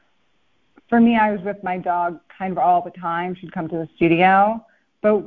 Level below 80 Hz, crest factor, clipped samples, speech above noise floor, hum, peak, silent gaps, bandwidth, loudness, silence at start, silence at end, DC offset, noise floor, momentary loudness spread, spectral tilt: -56 dBFS; 18 dB; under 0.1%; 48 dB; none; -2 dBFS; none; 4.3 kHz; -20 LUFS; 0.9 s; 0 s; under 0.1%; -67 dBFS; 13 LU; -10 dB/octave